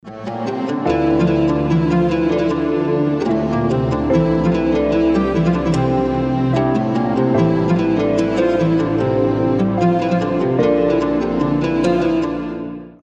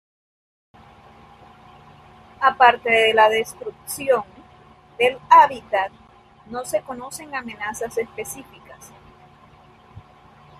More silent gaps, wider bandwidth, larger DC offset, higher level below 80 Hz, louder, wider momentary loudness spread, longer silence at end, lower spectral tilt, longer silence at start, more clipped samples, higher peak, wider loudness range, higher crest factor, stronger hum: neither; second, 8.2 kHz vs 15 kHz; neither; first, -36 dBFS vs -60 dBFS; about the same, -17 LUFS vs -19 LUFS; second, 3 LU vs 19 LU; second, 0.1 s vs 0.6 s; first, -8.5 dB/octave vs -2 dB/octave; second, 0.05 s vs 2.4 s; neither; about the same, -2 dBFS vs -2 dBFS; second, 1 LU vs 13 LU; second, 14 dB vs 22 dB; neither